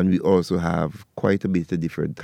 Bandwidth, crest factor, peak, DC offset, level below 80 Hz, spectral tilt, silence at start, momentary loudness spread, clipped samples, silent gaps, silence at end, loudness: 12.5 kHz; 16 dB; -6 dBFS; under 0.1%; -48 dBFS; -8 dB/octave; 0 s; 7 LU; under 0.1%; none; 0 s; -23 LUFS